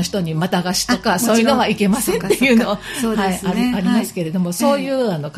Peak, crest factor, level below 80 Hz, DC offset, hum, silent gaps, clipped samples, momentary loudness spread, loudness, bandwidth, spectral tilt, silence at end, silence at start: -2 dBFS; 16 dB; -46 dBFS; under 0.1%; none; none; under 0.1%; 6 LU; -17 LUFS; 15.5 kHz; -4.5 dB/octave; 0 s; 0 s